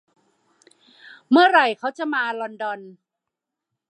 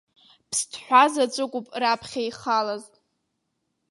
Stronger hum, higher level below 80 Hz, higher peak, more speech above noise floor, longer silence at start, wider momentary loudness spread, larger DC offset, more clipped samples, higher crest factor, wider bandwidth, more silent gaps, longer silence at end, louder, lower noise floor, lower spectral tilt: neither; second, -86 dBFS vs -70 dBFS; about the same, -4 dBFS vs -4 dBFS; first, 64 dB vs 53 dB; first, 1.3 s vs 0.5 s; first, 15 LU vs 12 LU; neither; neither; about the same, 20 dB vs 22 dB; second, 9.8 kHz vs 11.5 kHz; neither; about the same, 1 s vs 1.05 s; first, -20 LUFS vs -23 LUFS; first, -84 dBFS vs -77 dBFS; first, -4 dB/octave vs -1.5 dB/octave